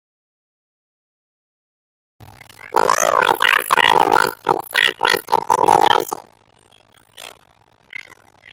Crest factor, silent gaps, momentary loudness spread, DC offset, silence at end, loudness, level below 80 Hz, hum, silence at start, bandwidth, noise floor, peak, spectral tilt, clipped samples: 20 dB; none; 22 LU; under 0.1%; 1.25 s; -15 LUFS; -60 dBFS; none; 2.65 s; 17 kHz; -55 dBFS; 0 dBFS; -1.5 dB/octave; under 0.1%